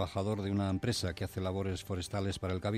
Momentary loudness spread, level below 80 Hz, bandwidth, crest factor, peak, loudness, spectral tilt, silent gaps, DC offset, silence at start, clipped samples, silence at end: 4 LU; -58 dBFS; 15 kHz; 16 dB; -20 dBFS; -35 LUFS; -6 dB/octave; none; under 0.1%; 0 s; under 0.1%; 0 s